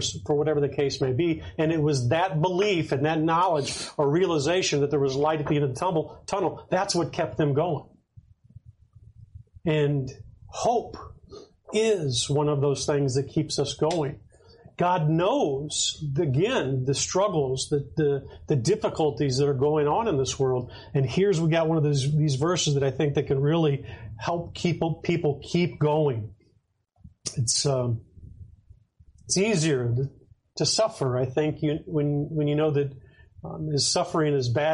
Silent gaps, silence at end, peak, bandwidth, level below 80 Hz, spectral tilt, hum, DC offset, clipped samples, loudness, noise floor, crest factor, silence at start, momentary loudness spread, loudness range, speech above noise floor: none; 0 s; -12 dBFS; 11.5 kHz; -54 dBFS; -5 dB/octave; none; under 0.1%; under 0.1%; -25 LUFS; -68 dBFS; 14 dB; 0 s; 7 LU; 5 LU; 43 dB